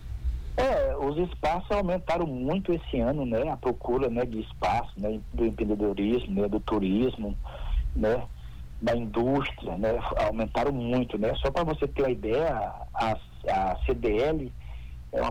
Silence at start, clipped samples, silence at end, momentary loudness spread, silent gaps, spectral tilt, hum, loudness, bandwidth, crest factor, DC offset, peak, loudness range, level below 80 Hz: 0 s; under 0.1%; 0 s; 7 LU; none; -7.5 dB/octave; none; -29 LUFS; 19 kHz; 14 dB; under 0.1%; -14 dBFS; 1 LU; -38 dBFS